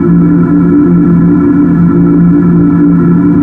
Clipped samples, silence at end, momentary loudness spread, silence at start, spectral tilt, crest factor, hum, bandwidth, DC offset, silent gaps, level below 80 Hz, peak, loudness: under 0.1%; 0 s; 1 LU; 0 s; -12.5 dB/octave; 6 dB; none; 2.5 kHz; under 0.1%; none; -30 dBFS; 0 dBFS; -6 LUFS